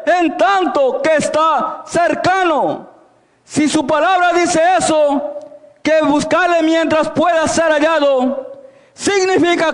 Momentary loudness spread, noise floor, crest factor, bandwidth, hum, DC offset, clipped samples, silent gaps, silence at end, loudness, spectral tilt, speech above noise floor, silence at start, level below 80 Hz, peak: 8 LU; -51 dBFS; 10 dB; 11 kHz; none; under 0.1%; under 0.1%; none; 0 s; -14 LUFS; -3.5 dB/octave; 37 dB; 0 s; -52 dBFS; -4 dBFS